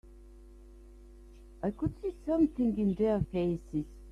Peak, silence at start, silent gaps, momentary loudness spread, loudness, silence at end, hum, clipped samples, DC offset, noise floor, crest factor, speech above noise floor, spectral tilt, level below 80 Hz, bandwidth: -16 dBFS; 0.05 s; none; 9 LU; -32 LUFS; 0 s; none; under 0.1%; under 0.1%; -52 dBFS; 16 dB; 22 dB; -9.5 dB/octave; -50 dBFS; 10.5 kHz